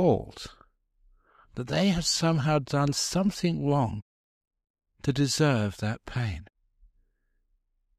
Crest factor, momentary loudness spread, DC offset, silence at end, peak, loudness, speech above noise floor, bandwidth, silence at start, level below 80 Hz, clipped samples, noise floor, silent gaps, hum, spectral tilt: 18 dB; 17 LU; under 0.1%; 1.55 s; -10 dBFS; -27 LUFS; 46 dB; 15 kHz; 0 s; -52 dBFS; under 0.1%; -72 dBFS; 4.02-4.41 s, 4.47-4.51 s, 4.70-4.74 s; none; -5 dB/octave